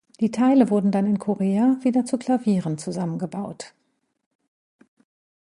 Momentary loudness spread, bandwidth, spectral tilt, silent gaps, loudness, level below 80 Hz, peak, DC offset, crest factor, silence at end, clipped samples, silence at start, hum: 13 LU; 11 kHz; -7.5 dB/octave; none; -22 LUFS; -68 dBFS; -6 dBFS; under 0.1%; 18 dB; 1.75 s; under 0.1%; 0.2 s; none